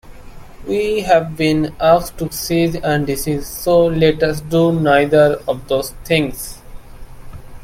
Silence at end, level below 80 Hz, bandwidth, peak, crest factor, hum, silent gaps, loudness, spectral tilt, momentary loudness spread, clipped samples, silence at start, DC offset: 0 s; -36 dBFS; 16.5 kHz; 0 dBFS; 16 dB; none; none; -16 LUFS; -5.5 dB/octave; 10 LU; under 0.1%; 0.05 s; under 0.1%